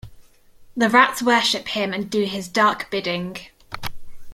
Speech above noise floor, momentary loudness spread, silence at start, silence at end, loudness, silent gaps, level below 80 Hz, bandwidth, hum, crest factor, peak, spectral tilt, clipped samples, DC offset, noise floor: 28 dB; 19 LU; 0.05 s; 0 s; -20 LUFS; none; -48 dBFS; 16.5 kHz; none; 20 dB; -2 dBFS; -3.5 dB/octave; under 0.1%; under 0.1%; -48 dBFS